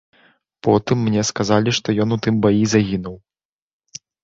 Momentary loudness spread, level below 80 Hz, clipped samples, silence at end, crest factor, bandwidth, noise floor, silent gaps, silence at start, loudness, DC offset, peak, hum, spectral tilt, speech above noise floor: 17 LU; -48 dBFS; under 0.1%; 1.05 s; 18 dB; 8 kHz; -57 dBFS; none; 0.65 s; -18 LUFS; under 0.1%; -2 dBFS; none; -5.5 dB/octave; 39 dB